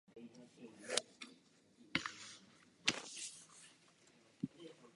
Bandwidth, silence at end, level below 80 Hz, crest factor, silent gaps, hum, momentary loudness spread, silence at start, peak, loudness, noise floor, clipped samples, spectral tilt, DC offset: 11.5 kHz; 0.05 s; -80 dBFS; 34 dB; none; none; 20 LU; 0.1 s; -16 dBFS; -43 LUFS; -69 dBFS; under 0.1%; -1.5 dB/octave; under 0.1%